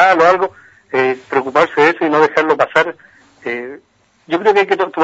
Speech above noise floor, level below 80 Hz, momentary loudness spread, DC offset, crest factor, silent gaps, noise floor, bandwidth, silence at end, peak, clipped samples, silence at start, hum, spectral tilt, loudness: 33 dB; -60 dBFS; 12 LU; under 0.1%; 14 dB; none; -47 dBFS; 8 kHz; 0 s; 0 dBFS; under 0.1%; 0 s; none; -5 dB/octave; -14 LUFS